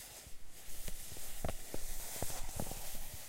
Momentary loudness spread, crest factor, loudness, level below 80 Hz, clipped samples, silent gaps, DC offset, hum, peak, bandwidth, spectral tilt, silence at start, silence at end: 10 LU; 16 dB; -45 LUFS; -46 dBFS; under 0.1%; none; under 0.1%; none; -22 dBFS; 16 kHz; -3 dB/octave; 0 s; 0 s